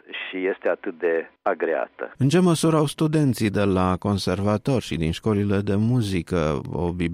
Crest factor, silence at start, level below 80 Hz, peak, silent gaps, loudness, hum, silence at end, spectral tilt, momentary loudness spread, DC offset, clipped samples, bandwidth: 14 dB; 0.1 s; -46 dBFS; -8 dBFS; none; -23 LUFS; none; 0 s; -6.5 dB/octave; 7 LU; under 0.1%; under 0.1%; 15.5 kHz